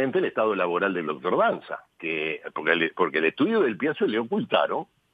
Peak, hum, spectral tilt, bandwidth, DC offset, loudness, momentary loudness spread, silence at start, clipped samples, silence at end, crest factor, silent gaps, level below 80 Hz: -6 dBFS; none; -7.5 dB/octave; 4.9 kHz; under 0.1%; -25 LUFS; 7 LU; 0 s; under 0.1%; 0.3 s; 20 dB; none; -76 dBFS